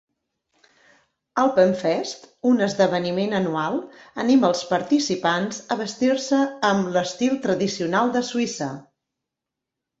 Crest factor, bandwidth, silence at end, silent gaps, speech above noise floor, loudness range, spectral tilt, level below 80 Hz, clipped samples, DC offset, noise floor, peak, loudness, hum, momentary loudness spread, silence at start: 18 dB; 8 kHz; 1.2 s; none; 63 dB; 2 LU; -5 dB/octave; -66 dBFS; under 0.1%; under 0.1%; -85 dBFS; -4 dBFS; -22 LUFS; none; 9 LU; 1.35 s